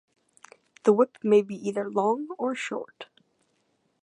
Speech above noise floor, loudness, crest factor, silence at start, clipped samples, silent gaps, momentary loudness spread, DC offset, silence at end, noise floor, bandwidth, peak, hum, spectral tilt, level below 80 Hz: 47 dB; -26 LUFS; 20 dB; 0.85 s; under 0.1%; none; 17 LU; under 0.1%; 1 s; -72 dBFS; 10 kHz; -8 dBFS; none; -6 dB/octave; -82 dBFS